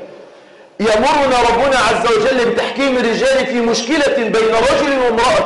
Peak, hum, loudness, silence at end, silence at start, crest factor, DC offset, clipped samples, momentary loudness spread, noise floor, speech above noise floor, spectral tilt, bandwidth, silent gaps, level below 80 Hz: -8 dBFS; none; -13 LUFS; 0 s; 0 s; 6 dB; under 0.1%; under 0.1%; 3 LU; -41 dBFS; 28 dB; -3.5 dB/octave; 11.5 kHz; none; -40 dBFS